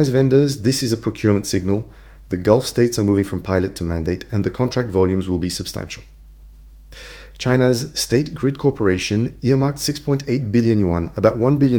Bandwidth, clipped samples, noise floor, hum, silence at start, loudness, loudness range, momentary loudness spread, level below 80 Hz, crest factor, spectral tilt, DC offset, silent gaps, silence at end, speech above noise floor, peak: 19.5 kHz; under 0.1%; -42 dBFS; none; 0 s; -19 LUFS; 4 LU; 10 LU; -42 dBFS; 18 dB; -6 dB/octave; under 0.1%; none; 0 s; 24 dB; 0 dBFS